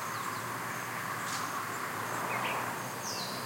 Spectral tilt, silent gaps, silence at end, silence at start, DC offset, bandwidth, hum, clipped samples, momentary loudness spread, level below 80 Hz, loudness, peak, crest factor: -2.5 dB/octave; none; 0 s; 0 s; under 0.1%; 16.5 kHz; none; under 0.1%; 4 LU; -76 dBFS; -35 LUFS; -20 dBFS; 16 dB